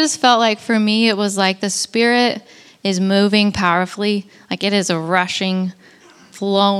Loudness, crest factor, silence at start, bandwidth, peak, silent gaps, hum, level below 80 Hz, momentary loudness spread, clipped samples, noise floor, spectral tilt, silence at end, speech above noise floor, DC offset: -17 LUFS; 18 dB; 0 s; 13 kHz; 0 dBFS; none; none; -54 dBFS; 9 LU; under 0.1%; -46 dBFS; -4 dB/octave; 0 s; 29 dB; under 0.1%